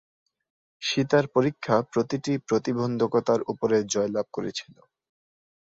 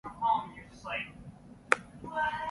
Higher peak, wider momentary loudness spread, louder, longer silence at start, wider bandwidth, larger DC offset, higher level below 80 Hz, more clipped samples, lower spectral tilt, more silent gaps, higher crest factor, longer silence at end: about the same, -6 dBFS vs -4 dBFS; second, 9 LU vs 20 LU; first, -26 LUFS vs -33 LUFS; first, 0.8 s vs 0.05 s; second, 7.8 kHz vs 11.5 kHz; neither; about the same, -64 dBFS vs -60 dBFS; neither; first, -5 dB/octave vs -3.5 dB/octave; neither; second, 20 dB vs 32 dB; first, 1.15 s vs 0 s